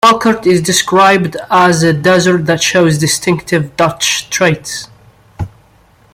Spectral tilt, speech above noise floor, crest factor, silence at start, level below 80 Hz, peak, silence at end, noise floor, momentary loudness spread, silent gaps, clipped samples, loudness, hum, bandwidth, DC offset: -4 dB/octave; 36 dB; 12 dB; 0.05 s; -44 dBFS; 0 dBFS; 0.65 s; -47 dBFS; 14 LU; none; under 0.1%; -11 LUFS; none; 16.5 kHz; under 0.1%